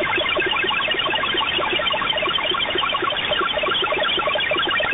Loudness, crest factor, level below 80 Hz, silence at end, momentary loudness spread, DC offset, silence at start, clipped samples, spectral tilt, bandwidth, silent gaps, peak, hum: -19 LUFS; 12 dB; -48 dBFS; 0 s; 1 LU; under 0.1%; 0 s; under 0.1%; -6.5 dB/octave; 4 kHz; none; -8 dBFS; none